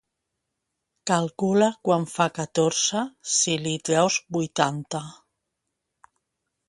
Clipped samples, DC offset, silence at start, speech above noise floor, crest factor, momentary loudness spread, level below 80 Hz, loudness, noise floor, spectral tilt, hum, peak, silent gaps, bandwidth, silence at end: under 0.1%; under 0.1%; 1.05 s; 57 dB; 22 dB; 10 LU; -68 dBFS; -24 LUFS; -81 dBFS; -3.5 dB/octave; none; -4 dBFS; none; 11.5 kHz; 1.55 s